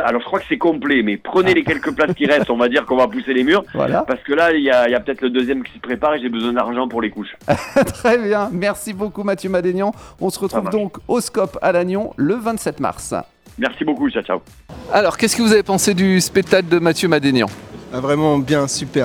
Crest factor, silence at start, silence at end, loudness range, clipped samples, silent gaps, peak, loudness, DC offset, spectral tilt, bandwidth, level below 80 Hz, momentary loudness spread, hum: 18 dB; 0 s; 0 s; 5 LU; under 0.1%; none; 0 dBFS; -17 LUFS; under 0.1%; -4.5 dB/octave; 18.5 kHz; -48 dBFS; 9 LU; none